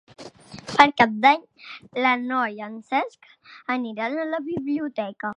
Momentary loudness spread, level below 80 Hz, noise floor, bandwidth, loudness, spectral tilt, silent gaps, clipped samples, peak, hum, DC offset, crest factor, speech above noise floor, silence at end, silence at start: 20 LU; -64 dBFS; -43 dBFS; 10.5 kHz; -22 LUFS; -4.5 dB/octave; none; under 0.1%; 0 dBFS; none; under 0.1%; 24 dB; 19 dB; 0.05 s; 0.2 s